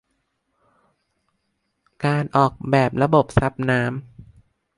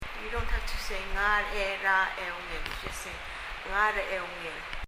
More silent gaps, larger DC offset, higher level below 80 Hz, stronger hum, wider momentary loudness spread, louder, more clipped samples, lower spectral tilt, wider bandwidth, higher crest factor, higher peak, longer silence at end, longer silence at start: neither; neither; about the same, -44 dBFS vs -40 dBFS; neither; second, 8 LU vs 11 LU; first, -20 LUFS vs -31 LUFS; neither; first, -7.5 dB/octave vs -3 dB/octave; second, 11.5 kHz vs 16 kHz; about the same, 20 dB vs 18 dB; first, -2 dBFS vs -12 dBFS; first, 0.55 s vs 0 s; first, 2 s vs 0 s